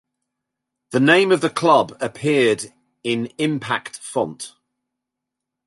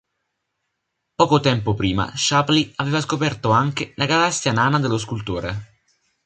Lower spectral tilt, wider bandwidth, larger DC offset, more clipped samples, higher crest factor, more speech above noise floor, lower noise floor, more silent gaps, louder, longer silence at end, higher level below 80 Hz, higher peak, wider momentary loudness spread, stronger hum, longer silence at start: about the same, -5 dB/octave vs -4.5 dB/octave; first, 11.5 kHz vs 9.4 kHz; neither; neither; about the same, 20 dB vs 18 dB; first, 64 dB vs 57 dB; first, -83 dBFS vs -77 dBFS; neither; about the same, -19 LUFS vs -20 LUFS; first, 1.2 s vs 0.6 s; second, -66 dBFS vs -46 dBFS; about the same, -2 dBFS vs -2 dBFS; first, 13 LU vs 9 LU; neither; second, 0.9 s vs 1.2 s